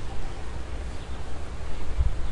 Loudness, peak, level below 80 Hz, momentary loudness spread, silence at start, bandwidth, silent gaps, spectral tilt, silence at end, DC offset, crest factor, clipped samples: -36 LUFS; -10 dBFS; -32 dBFS; 8 LU; 0 s; 10.5 kHz; none; -6 dB/octave; 0 s; under 0.1%; 14 dB; under 0.1%